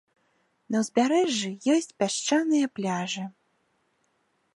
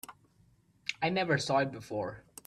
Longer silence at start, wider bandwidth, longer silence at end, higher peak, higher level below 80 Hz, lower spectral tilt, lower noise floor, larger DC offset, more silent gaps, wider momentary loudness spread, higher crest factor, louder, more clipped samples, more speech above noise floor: first, 0.7 s vs 0.1 s; second, 11.5 kHz vs 15.5 kHz; first, 1.25 s vs 0.25 s; first, -10 dBFS vs -14 dBFS; second, -78 dBFS vs -68 dBFS; about the same, -4 dB/octave vs -5 dB/octave; first, -72 dBFS vs -66 dBFS; neither; neither; second, 8 LU vs 12 LU; about the same, 18 dB vs 20 dB; first, -26 LUFS vs -32 LUFS; neither; first, 46 dB vs 35 dB